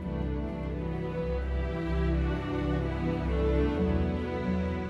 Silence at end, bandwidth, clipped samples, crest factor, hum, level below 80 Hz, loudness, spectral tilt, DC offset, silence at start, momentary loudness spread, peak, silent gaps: 0 s; 6.2 kHz; under 0.1%; 14 dB; none; -34 dBFS; -31 LUFS; -9 dB/octave; under 0.1%; 0 s; 6 LU; -16 dBFS; none